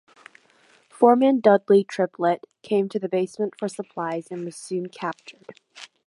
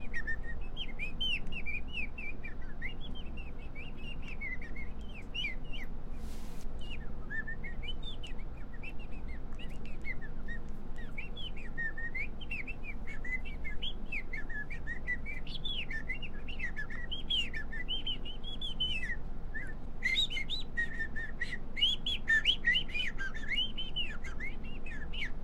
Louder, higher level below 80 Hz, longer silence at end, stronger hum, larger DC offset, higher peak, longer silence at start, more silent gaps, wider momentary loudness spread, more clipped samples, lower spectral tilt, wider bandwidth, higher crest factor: first, -23 LUFS vs -37 LUFS; second, -78 dBFS vs -38 dBFS; first, 0.2 s vs 0 s; neither; neither; first, -2 dBFS vs -18 dBFS; first, 1 s vs 0 s; neither; about the same, 17 LU vs 15 LU; neither; first, -6.5 dB/octave vs -3.5 dB/octave; first, 11.5 kHz vs 8.2 kHz; about the same, 20 dB vs 16 dB